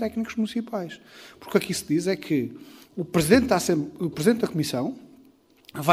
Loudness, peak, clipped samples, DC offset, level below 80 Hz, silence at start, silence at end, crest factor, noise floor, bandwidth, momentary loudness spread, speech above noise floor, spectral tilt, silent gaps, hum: -25 LUFS; -2 dBFS; under 0.1%; under 0.1%; -54 dBFS; 0 s; 0 s; 22 dB; -56 dBFS; 16 kHz; 20 LU; 31 dB; -5 dB/octave; none; none